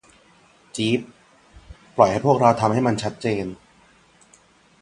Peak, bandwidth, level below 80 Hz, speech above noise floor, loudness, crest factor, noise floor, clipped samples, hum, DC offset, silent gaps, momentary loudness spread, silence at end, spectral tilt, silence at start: 0 dBFS; 11 kHz; -54 dBFS; 36 dB; -21 LUFS; 22 dB; -55 dBFS; under 0.1%; none; under 0.1%; none; 14 LU; 1.3 s; -6 dB/octave; 0.75 s